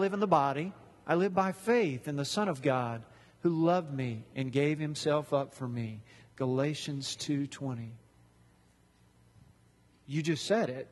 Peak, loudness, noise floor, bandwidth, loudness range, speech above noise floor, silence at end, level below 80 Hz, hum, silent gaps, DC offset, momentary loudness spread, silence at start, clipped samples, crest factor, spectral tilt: -10 dBFS; -32 LUFS; -65 dBFS; 12.5 kHz; 9 LU; 34 dB; 0.05 s; -70 dBFS; none; none; under 0.1%; 11 LU; 0 s; under 0.1%; 22 dB; -6 dB/octave